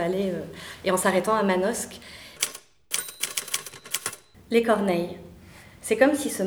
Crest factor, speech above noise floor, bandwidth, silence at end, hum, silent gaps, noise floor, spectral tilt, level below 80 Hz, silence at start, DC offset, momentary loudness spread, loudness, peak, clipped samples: 22 dB; 24 dB; over 20 kHz; 0 s; none; none; -48 dBFS; -3.5 dB/octave; -60 dBFS; 0 s; under 0.1%; 17 LU; -26 LUFS; -4 dBFS; under 0.1%